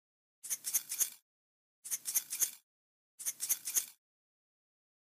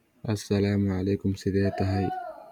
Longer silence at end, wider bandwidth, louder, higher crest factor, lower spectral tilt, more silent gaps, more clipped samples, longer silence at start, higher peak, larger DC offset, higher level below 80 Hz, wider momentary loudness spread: first, 1.25 s vs 0 s; first, 15.5 kHz vs 13 kHz; second, -35 LUFS vs -27 LUFS; first, 26 dB vs 14 dB; second, 3.5 dB/octave vs -7.5 dB/octave; first, 1.22-1.83 s, 2.63-3.18 s vs none; neither; first, 0.45 s vs 0.25 s; about the same, -14 dBFS vs -12 dBFS; neither; second, under -90 dBFS vs -56 dBFS; about the same, 9 LU vs 7 LU